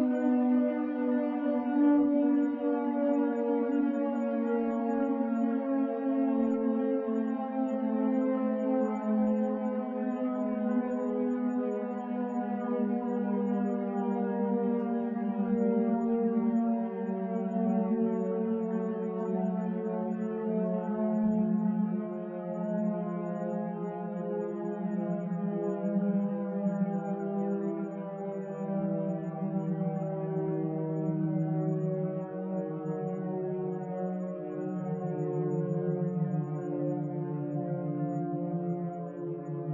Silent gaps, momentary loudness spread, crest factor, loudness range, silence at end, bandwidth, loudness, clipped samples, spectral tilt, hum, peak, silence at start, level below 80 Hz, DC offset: none; 7 LU; 14 dB; 5 LU; 0 s; 7.2 kHz; -31 LUFS; under 0.1%; -11 dB/octave; none; -16 dBFS; 0 s; -76 dBFS; under 0.1%